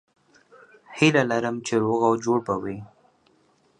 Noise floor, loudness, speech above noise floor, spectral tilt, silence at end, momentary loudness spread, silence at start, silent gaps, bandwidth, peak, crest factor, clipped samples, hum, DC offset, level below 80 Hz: -63 dBFS; -23 LUFS; 40 dB; -5.5 dB/octave; 0.95 s; 15 LU; 0.9 s; none; 10.5 kHz; -4 dBFS; 22 dB; under 0.1%; none; under 0.1%; -64 dBFS